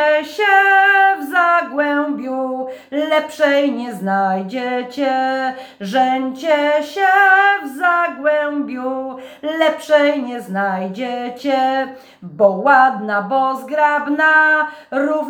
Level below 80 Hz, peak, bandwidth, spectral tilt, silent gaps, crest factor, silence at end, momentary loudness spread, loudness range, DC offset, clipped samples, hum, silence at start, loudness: -72 dBFS; 0 dBFS; over 20 kHz; -5 dB/octave; none; 16 dB; 0 s; 12 LU; 4 LU; under 0.1%; under 0.1%; none; 0 s; -16 LUFS